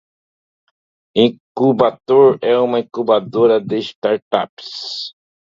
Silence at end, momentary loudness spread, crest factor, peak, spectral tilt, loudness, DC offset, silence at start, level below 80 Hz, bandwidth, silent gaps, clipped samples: 0.5 s; 13 LU; 16 dB; 0 dBFS; -6.5 dB/octave; -16 LUFS; under 0.1%; 1.15 s; -62 dBFS; 7.4 kHz; 1.40-1.55 s, 3.95-4.02 s, 4.22-4.31 s, 4.49-4.57 s; under 0.1%